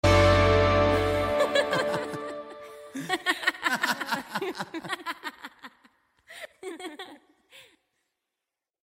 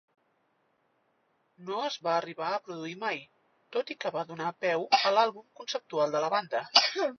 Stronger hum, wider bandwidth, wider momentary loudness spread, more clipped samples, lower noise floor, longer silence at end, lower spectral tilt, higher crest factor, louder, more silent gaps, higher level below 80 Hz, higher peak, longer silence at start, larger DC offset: neither; first, 16 kHz vs 6.6 kHz; first, 23 LU vs 13 LU; neither; first, -87 dBFS vs -73 dBFS; first, 1.25 s vs 0.05 s; first, -5 dB/octave vs -2.5 dB/octave; second, 20 dB vs 26 dB; first, -26 LUFS vs -29 LUFS; neither; first, -42 dBFS vs -86 dBFS; about the same, -6 dBFS vs -4 dBFS; second, 0.05 s vs 1.6 s; neither